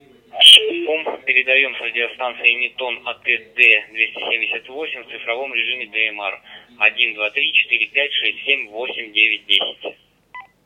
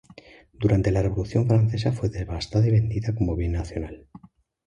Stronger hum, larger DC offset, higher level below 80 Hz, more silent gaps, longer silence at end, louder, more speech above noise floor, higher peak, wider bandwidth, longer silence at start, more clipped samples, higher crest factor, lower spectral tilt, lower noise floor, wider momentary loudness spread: neither; neither; second, -70 dBFS vs -36 dBFS; neither; second, 0.25 s vs 0.7 s; first, -15 LUFS vs -24 LUFS; second, 21 dB vs 26 dB; first, 0 dBFS vs -8 dBFS; first, 16.5 kHz vs 9 kHz; second, 0.35 s vs 0.6 s; first, 0.2% vs under 0.1%; about the same, 18 dB vs 16 dB; second, 0.5 dB/octave vs -8 dB/octave; second, -41 dBFS vs -49 dBFS; first, 14 LU vs 11 LU